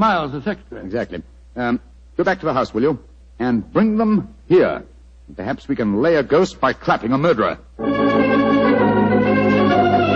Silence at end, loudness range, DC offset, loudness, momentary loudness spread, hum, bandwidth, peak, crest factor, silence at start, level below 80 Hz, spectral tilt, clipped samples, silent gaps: 0 s; 5 LU; under 0.1%; -18 LUFS; 12 LU; none; 7.8 kHz; -4 dBFS; 14 dB; 0 s; -44 dBFS; -7.5 dB/octave; under 0.1%; none